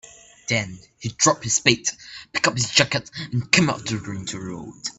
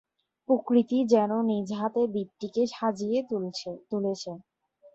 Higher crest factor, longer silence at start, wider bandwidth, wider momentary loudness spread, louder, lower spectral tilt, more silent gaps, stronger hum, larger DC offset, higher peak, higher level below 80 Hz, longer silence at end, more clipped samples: first, 24 dB vs 18 dB; second, 0.05 s vs 0.5 s; first, 12 kHz vs 8 kHz; first, 16 LU vs 12 LU; first, -21 LUFS vs -28 LUFS; second, -2.5 dB/octave vs -6.5 dB/octave; neither; neither; neither; first, 0 dBFS vs -8 dBFS; first, -56 dBFS vs -74 dBFS; about the same, 0.05 s vs 0.05 s; neither